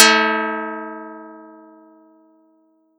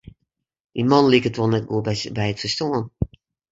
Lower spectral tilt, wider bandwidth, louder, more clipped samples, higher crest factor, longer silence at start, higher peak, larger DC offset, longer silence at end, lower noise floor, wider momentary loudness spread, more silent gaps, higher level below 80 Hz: second, -0.5 dB/octave vs -6 dB/octave; first, over 20 kHz vs 7.8 kHz; first, -18 LUFS vs -21 LUFS; neither; about the same, 22 dB vs 20 dB; second, 0 s vs 0.75 s; about the same, 0 dBFS vs -2 dBFS; neither; first, 1.5 s vs 0.45 s; second, -59 dBFS vs -76 dBFS; first, 25 LU vs 14 LU; neither; second, under -90 dBFS vs -44 dBFS